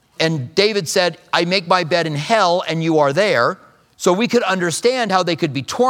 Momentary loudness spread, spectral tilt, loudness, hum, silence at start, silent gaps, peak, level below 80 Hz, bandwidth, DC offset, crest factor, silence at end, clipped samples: 5 LU; -4 dB/octave; -17 LUFS; none; 0.2 s; none; 0 dBFS; -66 dBFS; 17.5 kHz; under 0.1%; 16 dB; 0 s; under 0.1%